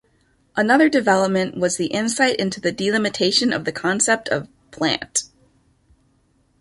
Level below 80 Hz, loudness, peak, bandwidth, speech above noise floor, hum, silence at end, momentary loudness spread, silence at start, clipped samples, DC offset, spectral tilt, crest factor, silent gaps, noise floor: -58 dBFS; -19 LUFS; -2 dBFS; 11.5 kHz; 42 dB; none; 1.35 s; 8 LU; 0.55 s; under 0.1%; under 0.1%; -3 dB/octave; 18 dB; none; -62 dBFS